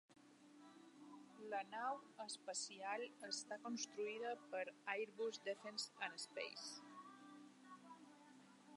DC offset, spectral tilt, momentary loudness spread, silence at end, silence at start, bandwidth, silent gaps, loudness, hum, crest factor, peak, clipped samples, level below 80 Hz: under 0.1%; -1.5 dB/octave; 18 LU; 0 s; 0.1 s; 11.5 kHz; none; -48 LUFS; none; 22 dB; -30 dBFS; under 0.1%; under -90 dBFS